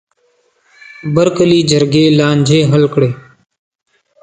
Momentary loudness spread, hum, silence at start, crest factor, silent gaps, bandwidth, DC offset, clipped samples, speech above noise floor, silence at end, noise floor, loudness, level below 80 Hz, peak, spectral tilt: 7 LU; none; 1.05 s; 14 dB; none; 9.4 kHz; under 0.1%; under 0.1%; 47 dB; 1 s; -58 dBFS; -11 LUFS; -50 dBFS; 0 dBFS; -6 dB/octave